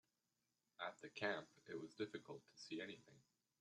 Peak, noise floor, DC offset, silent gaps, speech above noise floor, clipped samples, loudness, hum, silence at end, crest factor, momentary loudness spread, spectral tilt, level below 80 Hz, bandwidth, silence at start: -28 dBFS; -90 dBFS; under 0.1%; none; 38 dB; under 0.1%; -51 LUFS; none; 0.4 s; 26 dB; 11 LU; -4.5 dB/octave; under -90 dBFS; 11.5 kHz; 0.8 s